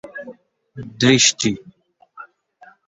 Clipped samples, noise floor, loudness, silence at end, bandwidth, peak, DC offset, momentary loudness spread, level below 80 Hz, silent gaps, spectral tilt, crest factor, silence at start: under 0.1%; -50 dBFS; -15 LUFS; 0.65 s; 8 kHz; 0 dBFS; under 0.1%; 24 LU; -56 dBFS; none; -3 dB/octave; 22 dB; 0.05 s